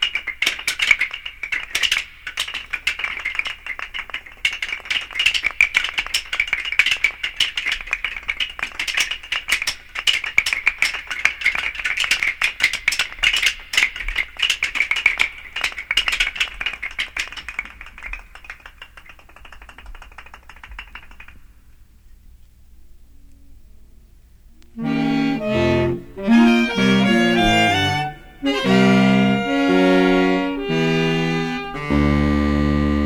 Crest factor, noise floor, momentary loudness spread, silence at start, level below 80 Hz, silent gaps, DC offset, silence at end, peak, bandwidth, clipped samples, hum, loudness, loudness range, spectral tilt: 20 dB; -47 dBFS; 12 LU; 0 s; -38 dBFS; none; under 0.1%; 0 s; 0 dBFS; over 20 kHz; under 0.1%; none; -19 LUFS; 11 LU; -4 dB/octave